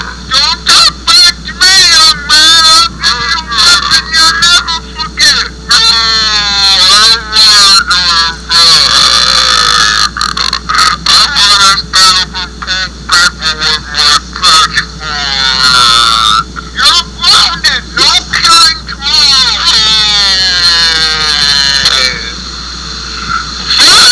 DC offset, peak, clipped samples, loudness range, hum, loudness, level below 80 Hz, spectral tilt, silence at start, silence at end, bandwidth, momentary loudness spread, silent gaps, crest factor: 0.3%; 0 dBFS; 4%; 3 LU; none; -4 LUFS; -28 dBFS; 0.5 dB/octave; 0 s; 0 s; 11 kHz; 11 LU; none; 8 dB